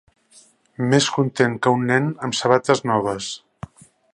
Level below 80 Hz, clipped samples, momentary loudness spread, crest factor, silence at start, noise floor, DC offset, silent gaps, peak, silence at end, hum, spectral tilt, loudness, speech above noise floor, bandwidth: -58 dBFS; under 0.1%; 16 LU; 20 dB; 0.8 s; -53 dBFS; under 0.1%; none; 0 dBFS; 0.75 s; none; -5 dB/octave; -20 LUFS; 34 dB; 11.5 kHz